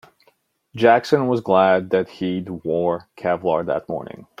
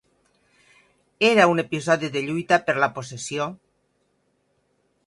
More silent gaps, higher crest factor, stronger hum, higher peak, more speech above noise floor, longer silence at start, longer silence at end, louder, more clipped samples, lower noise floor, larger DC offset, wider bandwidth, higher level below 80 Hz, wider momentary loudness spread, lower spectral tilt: neither; about the same, 18 dB vs 20 dB; neither; about the same, -2 dBFS vs -4 dBFS; second, 43 dB vs 47 dB; second, 0.75 s vs 1.2 s; second, 0.2 s vs 1.5 s; about the same, -20 LUFS vs -22 LUFS; neither; second, -62 dBFS vs -69 dBFS; neither; about the same, 12 kHz vs 11.5 kHz; first, -62 dBFS vs -68 dBFS; about the same, 12 LU vs 13 LU; first, -7 dB/octave vs -4.5 dB/octave